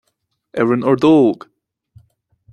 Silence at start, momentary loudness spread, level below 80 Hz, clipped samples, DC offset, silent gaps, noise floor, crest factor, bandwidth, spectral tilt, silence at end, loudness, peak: 0.55 s; 16 LU; -58 dBFS; under 0.1%; under 0.1%; none; -70 dBFS; 16 dB; 8.6 kHz; -8 dB/octave; 1.2 s; -14 LUFS; -2 dBFS